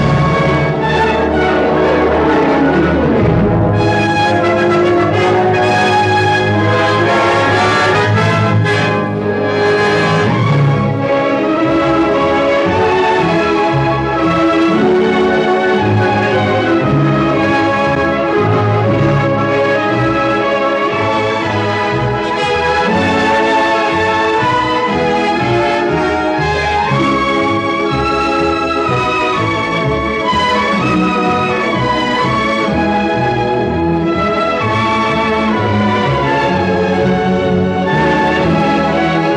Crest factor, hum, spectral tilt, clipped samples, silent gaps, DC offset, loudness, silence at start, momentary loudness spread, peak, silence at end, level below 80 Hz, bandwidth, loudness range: 12 dB; none; -6.5 dB/octave; under 0.1%; none; under 0.1%; -12 LUFS; 0 s; 3 LU; 0 dBFS; 0 s; -34 dBFS; 10.5 kHz; 2 LU